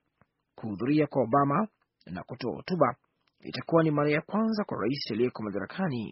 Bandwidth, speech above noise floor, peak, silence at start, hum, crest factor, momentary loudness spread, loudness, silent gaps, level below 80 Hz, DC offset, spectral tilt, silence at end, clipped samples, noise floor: 5.8 kHz; 43 dB; -8 dBFS; 0.6 s; none; 20 dB; 15 LU; -29 LUFS; none; -68 dBFS; under 0.1%; -6 dB/octave; 0 s; under 0.1%; -71 dBFS